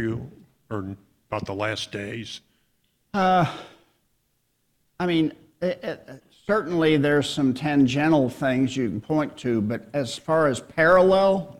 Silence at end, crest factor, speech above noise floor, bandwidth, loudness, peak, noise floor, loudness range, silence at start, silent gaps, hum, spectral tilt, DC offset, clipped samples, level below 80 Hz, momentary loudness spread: 0.05 s; 18 dB; 48 dB; 13.5 kHz; -23 LUFS; -6 dBFS; -71 dBFS; 7 LU; 0 s; none; none; -6 dB/octave; under 0.1%; under 0.1%; -56 dBFS; 16 LU